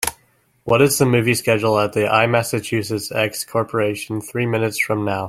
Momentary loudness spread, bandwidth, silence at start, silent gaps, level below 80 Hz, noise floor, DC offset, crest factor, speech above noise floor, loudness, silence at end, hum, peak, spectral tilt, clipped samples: 8 LU; 16.5 kHz; 0 s; none; -54 dBFS; -59 dBFS; under 0.1%; 18 dB; 41 dB; -19 LUFS; 0 s; none; 0 dBFS; -4.5 dB/octave; under 0.1%